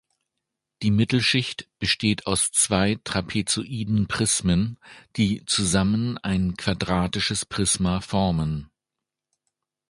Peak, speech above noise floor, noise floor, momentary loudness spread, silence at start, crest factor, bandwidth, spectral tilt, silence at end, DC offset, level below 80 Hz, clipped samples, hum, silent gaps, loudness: -4 dBFS; 63 dB; -86 dBFS; 7 LU; 0.8 s; 20 dB; 11.5 kHz; -4 dB/octave; 1.25 s; under 0.1%; -44 dBFS; under 0.1%; none; none; -23 LUFS